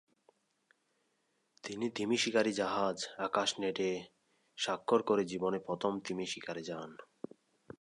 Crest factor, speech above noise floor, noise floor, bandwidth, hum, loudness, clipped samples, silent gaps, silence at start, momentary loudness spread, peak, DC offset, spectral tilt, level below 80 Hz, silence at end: 22 dB; 44 dB; -79 dBFS; 11 kHz; none; -35 LUFS; under 0.1%; none; 1.65 s; 18 LU; -16 dBFS; under 0.1%; -3.5 dB/octave; -76 dBFS; 0.75 s